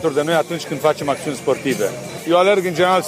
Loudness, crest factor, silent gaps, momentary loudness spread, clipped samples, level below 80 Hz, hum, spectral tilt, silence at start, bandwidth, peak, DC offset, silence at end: -18 LUFS; 14 dB; none; 8 LU; under 0.1%; -60 dBFS; none; -4.5 dB/octave; 0 s; 15.5 kHz; -4 dBFS; under 0.1%; 0 s